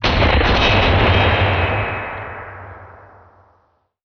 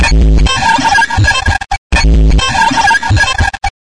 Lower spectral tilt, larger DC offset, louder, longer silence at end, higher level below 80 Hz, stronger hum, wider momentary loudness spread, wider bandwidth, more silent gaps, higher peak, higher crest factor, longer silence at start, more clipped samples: about the same, -3.5 dB/octave vs -4 dB/octave; second, under 0.1% vs 4%; second, -15 LUFS vs -10 LUFS; first, 1.1 s vs 0.15 s; second, -26 dBFS vs -12 dBFS; neither; first, 19 LU vs 5 LU; second, 6.6 kHz vs 10.5 kHz; second, none vs 1.78-1.90 s; about the same, -4 dBFS vs -2 dBFS; first, 14 dB vs 8 dB; about the same, 0 s vs 0 s; neither